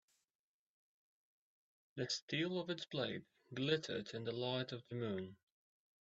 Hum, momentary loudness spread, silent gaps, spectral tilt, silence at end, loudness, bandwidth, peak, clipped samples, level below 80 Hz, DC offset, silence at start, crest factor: none; 10 LU; 2.22-2.28 s; -4 dB/octave; 0.75 s; -42 LUFS; 8 kHz; -24 dBFS; under 0.1%; -82 dBFS; under 0.1%; 1.95 s; 22 dB